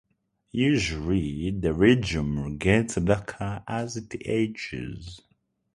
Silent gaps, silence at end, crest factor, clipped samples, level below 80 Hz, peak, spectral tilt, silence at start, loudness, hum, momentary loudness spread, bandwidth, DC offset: none; 0.55 s; 22 dB; under 0.1%; -42 dBFS; -4 dBFS; -6 dB/octave; 0.55 s; -26 LUFS; none; 13 LU; 11.5 kHz; under 0.1%